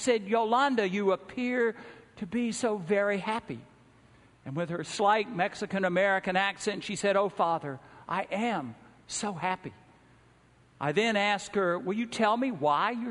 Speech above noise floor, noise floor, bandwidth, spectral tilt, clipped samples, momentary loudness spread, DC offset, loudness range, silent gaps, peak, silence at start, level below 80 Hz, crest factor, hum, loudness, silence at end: 32 dB; -61 dBFS; 10.5 kHz; -4.5 dB/octave; under 0.1%; 11 LU; under 0.1%; 5 LU; none; -10 dBFS; 0 s; -68 dBFS; 20 dB; none; -29 LUFS; 0 s